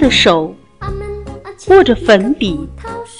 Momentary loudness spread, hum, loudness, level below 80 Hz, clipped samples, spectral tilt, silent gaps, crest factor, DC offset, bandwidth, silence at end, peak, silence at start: 19 LU; none; -11 LUFS; -32 dBFS; 0.2%; -4.5 dB/octave; none; 14 dB; 0.3%; 11 kHz; 0 s; 0 dBFS; 0 s